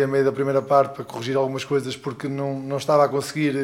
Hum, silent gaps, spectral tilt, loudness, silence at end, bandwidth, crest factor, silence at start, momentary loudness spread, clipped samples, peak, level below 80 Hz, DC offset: none; none; -6 dB/octave; -23 LUFS; 0 s; 16.5 kHz; 16 dB; 0 s; 10 LU; under 0.1%; -6 dBFS; -66 dBFS; under 0.1%